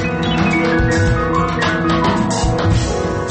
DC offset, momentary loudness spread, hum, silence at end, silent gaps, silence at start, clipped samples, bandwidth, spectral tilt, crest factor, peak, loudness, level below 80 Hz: under 0.1%; 2 LU; none; 0 s; none; 0 s; under 0.1%; 8.8 kHz; -5.5 dB/octave; 10 dB; -4 dBFS; -16 LUFS; -26 dBFS